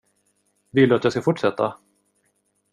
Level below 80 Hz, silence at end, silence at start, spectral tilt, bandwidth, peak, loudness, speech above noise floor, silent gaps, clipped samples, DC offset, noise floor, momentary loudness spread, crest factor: -64 dBFS; 1 s; 0.75 s; -7 dB/octave; 11 kHz; -4 dBFS; -21 LUFS; 50 dB; none; under 0.1%; under 0.1%; -69 dBFS; 9 LU; 20 dB